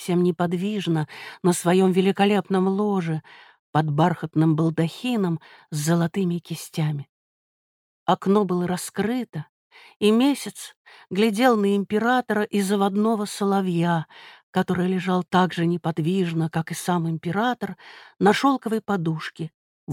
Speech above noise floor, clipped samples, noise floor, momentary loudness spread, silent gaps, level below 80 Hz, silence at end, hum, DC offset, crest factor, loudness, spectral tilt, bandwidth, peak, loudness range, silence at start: over 68 dB; under 0.1%; under -90 dBFS; 11 LU; 3.59-3.73 s, 7.09-8.06 s, 9.29-9.33 s, 9.49-9.70 s, 9.96-10.00 s, 10.76-10.85 s, 14.43-14.53 s, 19.54-19.87 s; -66 dBFS; 0 s; none; under 0.1%; 18 dB; -23 LUFS; -6 dB/octave; 16.5 kHz; -4 dBFS; 4 LU; 0 s